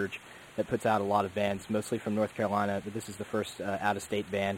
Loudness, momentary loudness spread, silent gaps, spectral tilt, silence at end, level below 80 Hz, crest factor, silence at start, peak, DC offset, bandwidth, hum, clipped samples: -32 LUFS; 8 LU; none; -5.5 dB/octave; 0 s; -64 dBFS; 18 dB; 0 s; -14 dBFS; under 0.1%; 16.5 kHz; none; under 0.1%